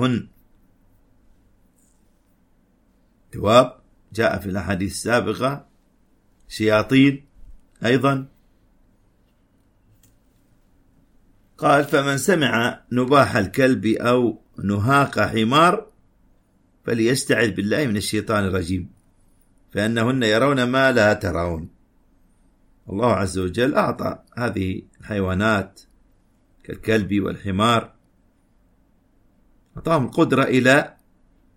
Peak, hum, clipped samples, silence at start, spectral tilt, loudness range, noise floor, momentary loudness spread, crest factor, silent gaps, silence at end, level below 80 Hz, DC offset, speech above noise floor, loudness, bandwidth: -2 dBFS; none; under 0.1%; 0 s; -5.5 dB/octave; 6 LU; -60 dBFS; 13 LU; 20 dB; none; 0.7 s; -50 dBFS; under 0.1%; 41 dB; -20 LUFS; 16.5 kHz